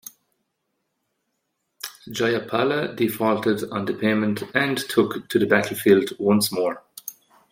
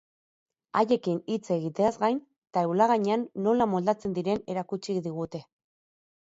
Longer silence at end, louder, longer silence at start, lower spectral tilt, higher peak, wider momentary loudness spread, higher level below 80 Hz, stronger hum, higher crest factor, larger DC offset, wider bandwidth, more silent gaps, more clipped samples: second, 0.4 s vs 0.85 s; first, -22 LUFS vs -28 LUFS; first, 1.85 s vs 0.75 s; second, -5 dB/octave vs -7 dB/octave; first, -2 dBFS vs -10 dBFS; first, 17 LU vs 9 LU; about the same, -66 dBFS vs -68 dBFS; neither; about the same, 20 dB vs 20 dB; neither; first, 16.5 kHz vs 8 kHz; second, none vs 2.38-2.42 s; neither